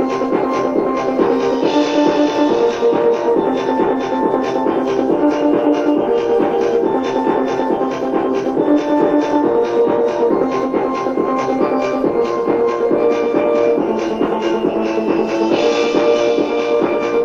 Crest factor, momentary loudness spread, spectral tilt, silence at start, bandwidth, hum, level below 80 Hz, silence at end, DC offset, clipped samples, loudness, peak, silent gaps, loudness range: 14 dB; 3 LU; -6 dB/octave; 0 s; 7.4 kHz; none; -50 dBFS; 0 s; under 0.1%; under 0.1%; -16 LUFS; -2 dBFS; none; 1 LU